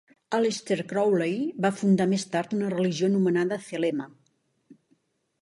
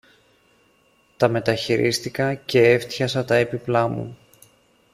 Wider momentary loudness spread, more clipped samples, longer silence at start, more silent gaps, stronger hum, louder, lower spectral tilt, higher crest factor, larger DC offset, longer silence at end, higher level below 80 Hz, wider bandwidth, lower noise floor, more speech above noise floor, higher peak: about the same, 6 LU vs 7 LU; neither; second, 0.3 s vs 1.2 s; neither; neither; second, -26 LUFS vs -21 LUFS; about the same, -6 dB/octave vs -5.5 dB/octave; about the same, 16 dB vs 20 dB; neither; about the same, 0.7 s vs 0.8 s; second, -72 dBFS vs -58 dBFS; second, 11.5 kHz vs 15.5 kHz; first, -70 dBFS vs -60 dBFS; first, 45 dB vs 40 dB; second, -10 dBFS vs -2 dBFS